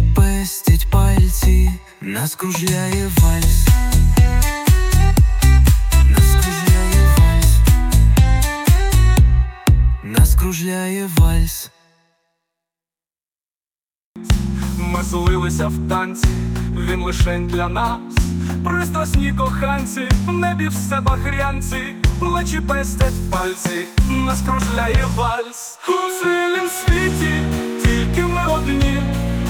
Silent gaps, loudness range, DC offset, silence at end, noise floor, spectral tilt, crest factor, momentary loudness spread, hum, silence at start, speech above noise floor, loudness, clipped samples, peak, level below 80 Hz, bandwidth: 13.56-13.61 s, 13.83-13.88 s, 13.97-14.15 s; 8 LU; under 0.1%; 0 s; under -90 dBFS; -5.5 dB/octave; 14 dB; 8 LU; none; 0 s; over 73 dB; -17 LUFS; under 0.1%; -2 dBFS; -18 dBFS; 17.5 kHz